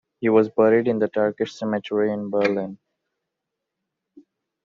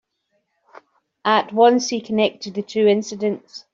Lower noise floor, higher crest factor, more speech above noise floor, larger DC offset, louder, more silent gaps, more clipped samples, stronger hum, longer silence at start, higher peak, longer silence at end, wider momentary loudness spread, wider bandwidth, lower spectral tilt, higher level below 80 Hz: first, -82 dBFS vs -71 dBFS; about the same, 18 dB vs 18 dB; first, 62 dB vs 52 dB; neither; about the same, -21 LUFS vs -19 LUFS; neither; neither; neither; second, 0.2 s vs 1.25 s; second, -6 dBFS vs -2 dBFS; first, 1.9 s vs 0.15 s; about the same, 9 LU vs 11 LU; about the same, 7.2 kHz vs 7.6 kHz; first, -5.5 dB/octave vs -4 dB/octave; about the same, -68 dBFS vs -68 dBFS